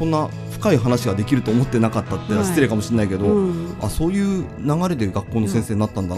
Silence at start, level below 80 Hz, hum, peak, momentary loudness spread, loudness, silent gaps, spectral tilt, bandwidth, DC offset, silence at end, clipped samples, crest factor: 0 s; -38 dBFS; none; -2 dBFS; 5 LU; -20 LUFS; none; -7 dB/octave; 15 kHz; under 0.1%; 0 s; under 0.1%; 18 dB